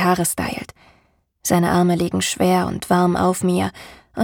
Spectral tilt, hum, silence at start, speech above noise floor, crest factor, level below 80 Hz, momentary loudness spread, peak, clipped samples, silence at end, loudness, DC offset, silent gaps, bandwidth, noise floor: -5 dB/octave; none; 0 s; 42 dB; 16 dB; -46 dBFS; 11 LU; -4 dBFS; under 0.1%; 0 s; -19 LUFS; under 0.1%; none; 18.5 kHz; -61 dBFS